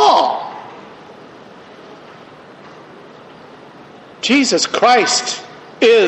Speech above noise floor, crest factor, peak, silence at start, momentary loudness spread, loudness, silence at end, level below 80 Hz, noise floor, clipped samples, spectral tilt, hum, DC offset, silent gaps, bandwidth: 26 dB; 16 dB; -2 dBFS; 0 s; 27 LU; -14 LUFS; 0 s; -64 dBFS; -39 dBFS; under 0.1%; -2 dB/octave; none; under 0.1%; none; 8.6 kHz